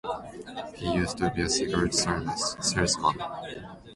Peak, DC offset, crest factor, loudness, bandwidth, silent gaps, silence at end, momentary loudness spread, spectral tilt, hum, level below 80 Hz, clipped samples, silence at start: -10 dBFS; under 0.1%; 18 dB; -27 LUFS; 11.5 kHz; none; 0 s; 14 LU; -3.5 dB/octave; none; -46 dBFS; under 0.1%; 0.05 s